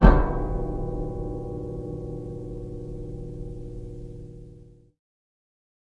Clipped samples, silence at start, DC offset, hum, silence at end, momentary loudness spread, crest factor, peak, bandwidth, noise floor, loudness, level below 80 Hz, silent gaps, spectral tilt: under 0.1%; 0 s; under 0.1%; none; 1.25 s; 14 LU; 26 dB; 0 dBFS; 4.7 kHz; -49 dBFS; -31 LUFS; -28 dBFS; none; -9.5 dB/octave